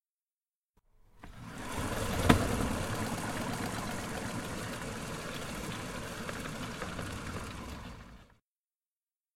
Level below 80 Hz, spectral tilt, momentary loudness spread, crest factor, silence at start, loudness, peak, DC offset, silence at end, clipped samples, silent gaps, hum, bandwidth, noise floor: -48 dBFS; -4.5 dB/octave; 15 LU; 30 dB; 1.15 s; -36 LUFS; -8 dBFS; under 0.1%; 1.1 s; under 0.1%; none; none; 16.5 kHz; under -90 dBFS